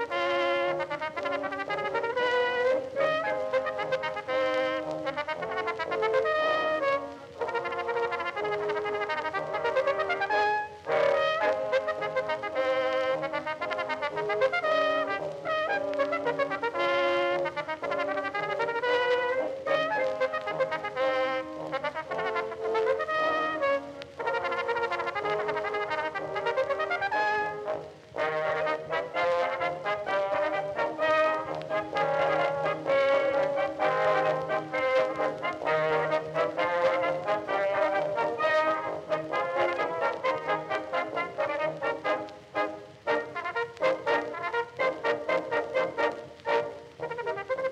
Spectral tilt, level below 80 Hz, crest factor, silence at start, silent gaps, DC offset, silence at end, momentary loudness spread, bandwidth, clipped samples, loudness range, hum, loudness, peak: -4.5 dB/octave; -68 dBFS; 16 dB; 0 s; none; under 0.1%; 0 s; 6 LU; 9.6 kHz; under 0.1%; 3 LU; none; -29 LUFS; -12 dBFS